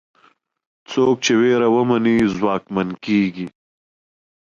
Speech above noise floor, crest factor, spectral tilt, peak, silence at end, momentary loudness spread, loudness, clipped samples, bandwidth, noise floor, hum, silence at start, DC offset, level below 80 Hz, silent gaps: 40 dB; 14 dB; -5.5 dB/octave; -6 dBFS; 0.9 s; 9 LU; -18 LUFS; under 0.1%; 7.4 kHz; -57 dBFS; none; 0.9 s; under 0.1%; -56 dBFS; none